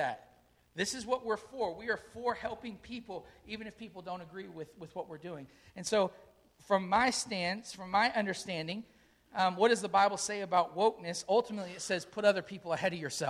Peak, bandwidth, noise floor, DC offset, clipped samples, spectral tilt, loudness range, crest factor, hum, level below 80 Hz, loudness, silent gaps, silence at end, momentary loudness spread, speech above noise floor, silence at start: -14 dBFS; 14.5 kHz; -66 dBFS; under 0.1%; under 0.1%; -3.5 dB/octave; 10 LU; 20 dB; none; -68 dBFS; -33 LUFS; none; 0 s; 17 LU; 32 dB; 0 s